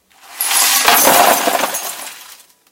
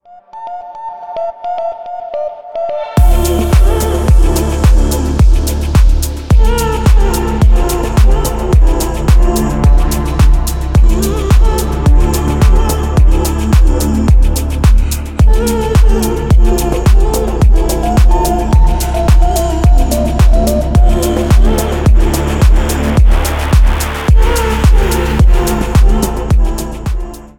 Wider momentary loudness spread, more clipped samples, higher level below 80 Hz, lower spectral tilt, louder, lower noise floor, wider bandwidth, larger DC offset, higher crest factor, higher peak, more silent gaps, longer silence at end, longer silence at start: first, 16 LU vs 8 LU; neither; second, -56 dBFS vs -10 dBFS; second, 0.5 dB/octave vs -6 dB/octave; about the same, -11 LUFS vs -12 LUFS; first, -41 dBFS vs -29 dBFS; first, over 20 kHz vs 17 kHz; neither; first, 14 dB vs 8 dB; about the same, 0 dBFS vs 0 dBFS; neither; first, 0.35 s vs 0.15 s; about the same, 0.3 s vs 0.35 s